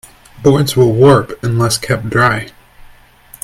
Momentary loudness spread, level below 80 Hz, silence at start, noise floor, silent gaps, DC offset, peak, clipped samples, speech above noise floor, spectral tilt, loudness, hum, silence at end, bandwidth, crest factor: 9 LU; -42 dBFS; 0.35 s; -42 dBFS; none; under 0.1%; 0 dBFS; under 0.1%; 30 dB; -5.5 dB/octave; -12 LUFS; none; 0.95 s; 15.5 kHz; 14 dB